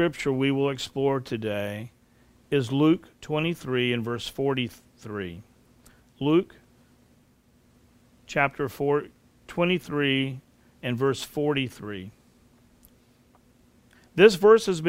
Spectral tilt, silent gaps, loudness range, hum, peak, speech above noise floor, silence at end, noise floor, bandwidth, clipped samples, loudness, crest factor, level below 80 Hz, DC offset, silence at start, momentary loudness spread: -6 dB/octave; none; 5 LU; none; -2 dBFS; 36 dB; 0 s; -61 dBFS; 16 kHz; under 0.1%; -25 LUFS; 24 dB; -60 dBFS; under 0.1%; 0 s; 19 LU